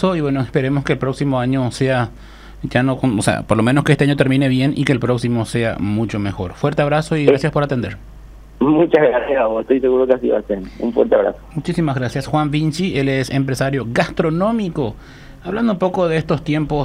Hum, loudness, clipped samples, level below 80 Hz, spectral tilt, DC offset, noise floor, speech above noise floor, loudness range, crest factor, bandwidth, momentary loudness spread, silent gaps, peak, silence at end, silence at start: none; -17 LUFS; under 0.1%; -40 dBFS; -7 dB/octave; under 0.1%; -38 dBFS; 21 dB; 3 LU; 16 dB; 14.5 kHz; 8 LU; none; 0 dBFS; 0 s; 0 s